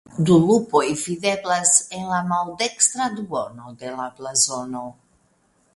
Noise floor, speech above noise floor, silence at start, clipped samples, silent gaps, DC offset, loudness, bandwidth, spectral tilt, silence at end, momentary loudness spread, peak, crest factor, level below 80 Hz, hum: -63 dBFS; 42 dB; 0.1 s; under 0.1%; none; under 0.1%; -20 LUFS; 12 kHz; -3.5 dB/octave; 0.85 s; 16 LU; 0 dBFS; 22 dB; -60 dBFS; none